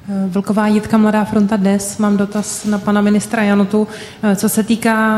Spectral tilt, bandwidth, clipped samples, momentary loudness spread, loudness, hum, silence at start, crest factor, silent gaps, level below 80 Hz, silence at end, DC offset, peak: -5.5 dB/octave; 14.5 kHz; under 0.1%; 5 LU; -15 LUFS; none; 0.05 s; 12 dB; none; -48 dBFS; 0 s; under 0.1%; -2 dBFS